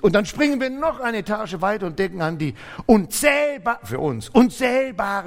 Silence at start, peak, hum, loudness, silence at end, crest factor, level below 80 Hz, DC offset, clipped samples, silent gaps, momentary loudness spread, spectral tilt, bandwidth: 0 s; -2 dBFS; none; -21 LUFS; 0 s; 20 dB; -46 dBFS; under 0.1%; under 0.1%; none; 8 LU; -5 dB/octave; 16.5 kHz